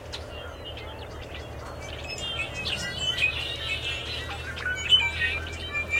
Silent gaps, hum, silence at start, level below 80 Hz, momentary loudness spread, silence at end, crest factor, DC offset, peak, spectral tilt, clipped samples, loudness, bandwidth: none; none; 0 s; -46 dBFS; 18 LU; 0 s; 22 dB; under 0.1%; -8 dBFS; -2.5 dB/octave; under 0.1%; -27 LUFS; 16.5 kHz